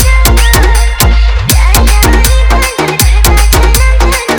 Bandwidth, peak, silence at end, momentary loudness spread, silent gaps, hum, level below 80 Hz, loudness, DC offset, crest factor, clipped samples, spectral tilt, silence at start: over 20 kHz; 0 dBFS; 0 s; 3 LU; none; none; -6 dBFS; -8 LUFS; under 0.1%; 6 dB; 0.6%; -3.5 dB/octave; 0 s